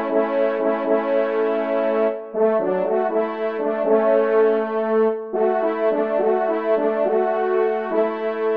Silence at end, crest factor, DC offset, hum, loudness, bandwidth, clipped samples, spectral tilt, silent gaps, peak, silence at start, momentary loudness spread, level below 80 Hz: 0 s; 14 dB; 0.2%; none; -20 LUFS; 4.9 kHz; under 0.1%; -8.5 dB/octave; none; -6 dBFS; 0 s; 5 LU; -72 dBFS